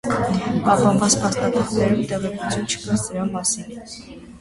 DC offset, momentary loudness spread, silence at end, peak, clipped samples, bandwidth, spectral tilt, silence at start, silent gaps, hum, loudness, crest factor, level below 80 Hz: under 0.1%; 18 LU; 0 s; -4 dBFS; under 0.1%; 11.5 kHz; -4.5 dB/octave; 0.05 s; none; none; -20 LUFS; 18 dB; -46 dBFS